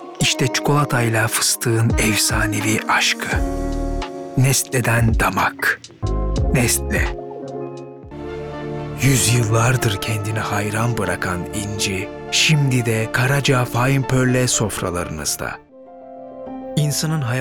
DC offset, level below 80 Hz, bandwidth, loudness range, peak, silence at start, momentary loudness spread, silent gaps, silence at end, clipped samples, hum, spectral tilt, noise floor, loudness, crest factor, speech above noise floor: under 0.1%; -32 dBFS; 19.5 kHz; 4 LU; -6 dBFS; 0 s; 14 LU; none; 0 s; under 0.1%; none; -4 dB/octave; -39 dBFS; -18 LUFS; 14 dB; 21 dB